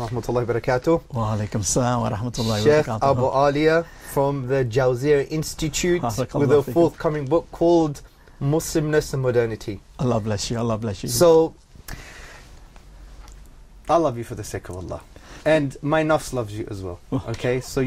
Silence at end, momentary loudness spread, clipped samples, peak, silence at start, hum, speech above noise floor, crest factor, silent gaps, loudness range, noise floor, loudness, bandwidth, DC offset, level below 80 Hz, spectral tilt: 0 s; 14 LU; under 0.1%; -6 dBFS; 0 s; none; 23 dB; 16 dB; none; 5 LU; -44 dBFS; -22 LUFS; 16 kHz; under 0.1%; -42 dBFS; -5.5 dB/octave